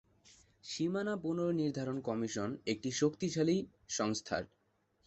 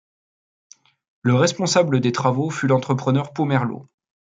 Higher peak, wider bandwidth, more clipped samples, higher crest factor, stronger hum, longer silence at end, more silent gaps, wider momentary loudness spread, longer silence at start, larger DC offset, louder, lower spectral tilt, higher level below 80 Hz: second, -18 dBFS vs -4 dBFS; second, 8.2 kHz vs 9.4 kHz; neither; about the same, 18 dB vs 18 dB; neither; about the same, 0.6 s vs 0.5 s; neither; about the same, 7 LU vs 6 LU; second, 0.65 s vs 1.25 s; neither; second, -36 LUFS vs -20 LUFS; about the same, -5 dB/octave vs -5.5 dB/octave; second, -70 dBFS vs -64 dBFS